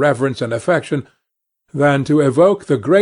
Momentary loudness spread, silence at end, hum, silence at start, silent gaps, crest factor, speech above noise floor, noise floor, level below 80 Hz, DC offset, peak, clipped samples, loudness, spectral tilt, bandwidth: 10 LU; 0 s; none; 0 s; none; 14 dB; 61 dB; -76 dBFS; -58 dBFS; under 0.1%; -2 dBFS; under 0.1%; -16 LUFS; -7 dB/octave; 11 kHz